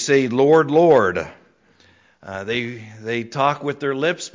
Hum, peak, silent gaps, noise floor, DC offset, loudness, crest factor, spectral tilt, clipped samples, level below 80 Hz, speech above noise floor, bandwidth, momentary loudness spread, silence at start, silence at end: none; -4 dBFS; none; -55 dBFS; under 0.1%; -18 LUFS; 16 dB; -5 dB/octave; under 0.1%; -56 dBFS; 37 dB; 7.6 kHz; 17 LU; 0 s; 0.05 s